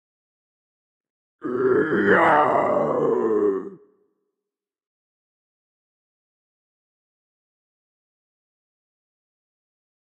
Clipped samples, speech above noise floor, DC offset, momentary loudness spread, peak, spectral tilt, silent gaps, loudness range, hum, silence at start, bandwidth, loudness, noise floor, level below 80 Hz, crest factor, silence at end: under 0.1%; 68 dB; under 0.1%; 14 LU; -4 dBFS; -7.5 dB/octave; none; 9 LU; none; 1.45 s; 8.6 kHz; -20 LUFS; -88 dBFS; -68 dBFS; 22 dB; 6.25 s